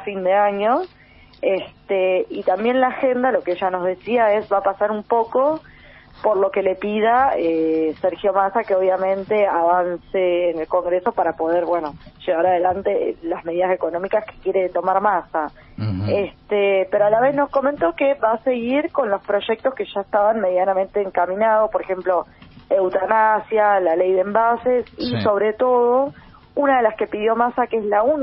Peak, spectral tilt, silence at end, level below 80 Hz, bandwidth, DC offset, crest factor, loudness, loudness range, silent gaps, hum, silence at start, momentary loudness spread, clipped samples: -2 dBFS; -4 dB/octave; 0 s; -54 dBFS; 5.6 kHz; under 0.1%; 18 dB; -19 LUFS; 2 LU; none; none; 0 s; 6 LU; under 0.1%